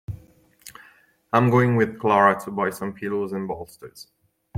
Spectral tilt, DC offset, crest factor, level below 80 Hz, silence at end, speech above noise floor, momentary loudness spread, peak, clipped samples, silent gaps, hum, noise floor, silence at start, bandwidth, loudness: -7 dB/octave; under 0.1%; 22 dB; -56 dBFS; 0 s; 34 dB; 24 LU; -2 dBFS; under 0.1%; none; none; -56 dBFS; 0.1 s; 16 kHz; -22 LUFS